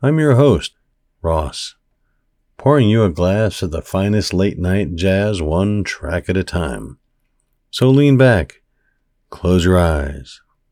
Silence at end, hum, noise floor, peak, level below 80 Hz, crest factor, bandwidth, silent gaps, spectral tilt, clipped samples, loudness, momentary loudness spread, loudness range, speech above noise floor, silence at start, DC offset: 0.35 s; none; -64 dBFS; 0 dBFS; -34 dBFS; 16 dB; 15 kHz; none; -7 dB/octave; under 0.1%; -16 LUFS; 15 LU; 3 LU; 49 dB; 0 s; under 0.1%